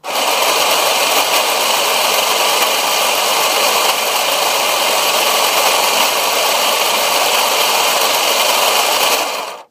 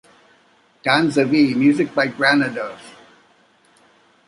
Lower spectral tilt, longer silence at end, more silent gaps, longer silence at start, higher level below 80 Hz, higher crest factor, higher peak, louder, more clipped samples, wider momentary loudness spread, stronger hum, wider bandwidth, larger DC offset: second, 1 dB/octave vs -5.5 dB/octave; second, 0.1 s vs 1.35 s; neither; second, 0.05 s vs 0.85 s; second, -78 dBFS vs -64 dBFS; second, 14 dB vs 20 dB; about the same, 0 dBFS vs -2 dBFS; first, -12 LUFS vs -17 LUFS; neither; second, 2 LU vs 13 LU; neither; first, 15.5 kHz vs 11.5 kHz; neither